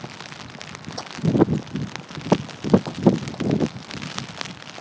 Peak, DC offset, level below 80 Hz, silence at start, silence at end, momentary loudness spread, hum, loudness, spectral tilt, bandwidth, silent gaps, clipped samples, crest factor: 0 dBFS; under 0.1%; -50 dBFS; 0 s; 0 s; 16 LU; none; -24 LUFS; -6.5 dB/octave; 8 kHz; none; under 0.1%; 24 dB